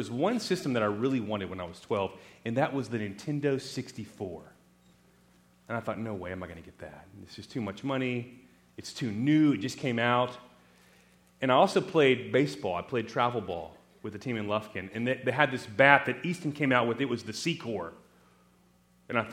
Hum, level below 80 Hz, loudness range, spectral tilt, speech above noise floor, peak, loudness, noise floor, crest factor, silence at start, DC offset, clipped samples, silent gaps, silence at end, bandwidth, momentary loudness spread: 60 Hz at -60 dBFS; -68 dBFS; 10 LU; -5.5 dB/octave; 34 dB; -2 dBFS; -29 LUFS; -64 dBFS; 28 dB; 0 s; under 0.1%; under 0.1%; none; 0 s; 15.5 kHz; 18 LU